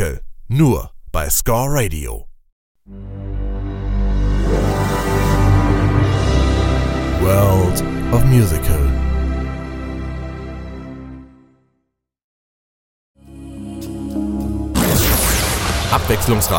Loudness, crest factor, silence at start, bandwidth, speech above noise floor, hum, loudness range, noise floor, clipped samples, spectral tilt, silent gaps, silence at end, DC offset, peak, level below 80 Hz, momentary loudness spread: -17 LUFS; 16 dB; 0 s; 17 kHz; 57 dB; none; 17 LU; -71 dBFS; under 0.1%; -5.5 dB/octave; 2.52-2.75 s, 12.24-13.14 s; 0 s; under 0.1%; 0 dBFS; -22 dBFS; 17 LU